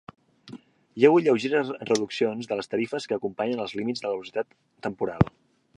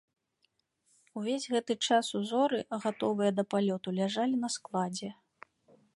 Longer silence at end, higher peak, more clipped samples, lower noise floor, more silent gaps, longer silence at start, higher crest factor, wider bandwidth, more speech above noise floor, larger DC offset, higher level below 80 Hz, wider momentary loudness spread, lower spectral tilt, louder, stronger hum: second, 0.5 s vs 0.85 s; first, -4 dBFS vs -14 dBFS; neither; second, -47 dBFS vs -77 dBFS; neither; second, 0.45 s vs 1.15 s; first, 24 dB vs 18 dB; about the same, 11.5 kHz vs 11.5 kHz; second, 22 dB vs 46 dB; neither; first, -52 dBFS vs -80 dBFS; first, 16 LU vs 8 LU; first, -6 dB/octave vs -4.5 dB/octave; first, -26 LUFS vs -31 LUFS; neither